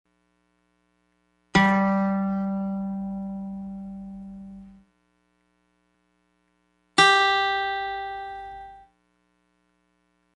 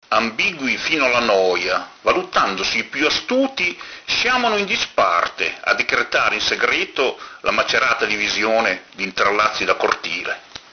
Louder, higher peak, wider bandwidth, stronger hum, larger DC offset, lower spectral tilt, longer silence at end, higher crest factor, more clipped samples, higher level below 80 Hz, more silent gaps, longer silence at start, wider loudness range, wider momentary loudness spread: second, -23 LUFS vs -18 LUFS; second, -4 dBFS vs 0 dBFS; first, 11.5 kHz vs 6.6 kHz; first, 60 Hz at -70 dBFS vs none; neither; first, -4.5 dB/octave vs -2 dB/octave; first, 1.55 s vs 0.15 s; about the same, 24 dB vs 20 dB; neither; about the same, -56 dBFS vs -52 dBFS; neither; first, 1.55 s vs 0.1 s; first, 16 LU vs 1 LU; first, 23 LU vs 5 LU